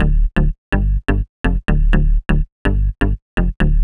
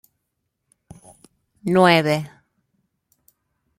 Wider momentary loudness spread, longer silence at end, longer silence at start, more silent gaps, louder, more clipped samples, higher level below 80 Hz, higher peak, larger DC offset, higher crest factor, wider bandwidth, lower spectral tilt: second, 4 LU vs 18 LU; second, 0 s vs 1.5 s; second, 0 s vs 1.65 s; first, 0.58-0.72 s, 1.29-1.44 s, 2.52-2.65 s, 3.22-3.37 s vs none; about the same, -19 LUFS vs -18 LUFS; neither; first, -16 dBFS vs -62 dBFS; about the same, -2 dBFS vs -2 dBFS; neither; second, 14 dB vs 22 dB; second, 3.9 kHz vs 16 kHz; first, -8.5 dB/octave vs -6 dB/octave